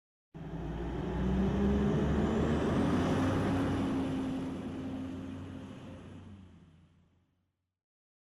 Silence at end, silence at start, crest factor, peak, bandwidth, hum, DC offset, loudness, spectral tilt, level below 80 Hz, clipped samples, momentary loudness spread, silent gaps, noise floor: 1.65 s; 0.35 s; 12 dB; -22 dBFS; 12 kHz; none; under 0.1%; -33 LUFS; -7.5 dB/octave; -44 dBFS; under 0.1%; 18 LU; none; -80 dBFS